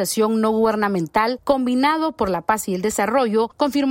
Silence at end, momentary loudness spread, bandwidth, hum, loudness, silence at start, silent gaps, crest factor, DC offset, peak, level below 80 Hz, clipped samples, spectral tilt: 0 s; 3 LU; 16.5 kHz; none; -20 LUFS; 0 s; none; 16 dB; under 0.1%; -4 dBFS; -50 dBFS; under 0.1%; -4.5 dB/octave